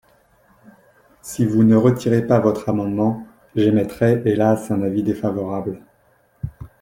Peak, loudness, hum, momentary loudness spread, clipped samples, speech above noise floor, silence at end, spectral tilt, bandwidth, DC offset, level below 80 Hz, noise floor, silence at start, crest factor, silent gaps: -2 dBFS; -19 LUFS; none; 18 LU; under 0.1%; 41 dB; 0.15 s; -8 dB/octave; 16.5 kHz; under 0.1%; -50 dBFS; -58 dBFS; 1.25 s; 18 dB; none